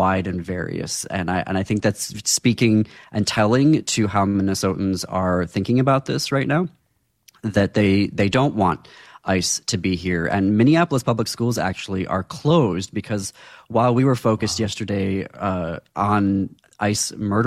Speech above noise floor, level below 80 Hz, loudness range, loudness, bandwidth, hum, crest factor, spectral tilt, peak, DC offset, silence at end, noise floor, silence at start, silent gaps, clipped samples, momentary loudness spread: 37 dB; -52 dBFS; 2 LU; -21 LUFS; 15 kHz; none; 14 dB; -5 dB/octave; -6 dBFS; under 0.1%; 0 s; -57 dBFS; 0 s; none; under 0.1%; 9 LU